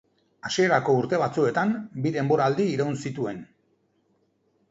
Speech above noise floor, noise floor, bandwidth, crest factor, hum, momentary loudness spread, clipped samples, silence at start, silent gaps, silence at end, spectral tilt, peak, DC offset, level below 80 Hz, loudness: 44 dB; -68 dBFS; 8 kHz; 18 dB; none; 10 LU; under 0.1%; 0.45 s; none; 1.25 s; -6 dB/octave; -8 dBFS; under 0.1%; -66 dBFS; -25 LUFS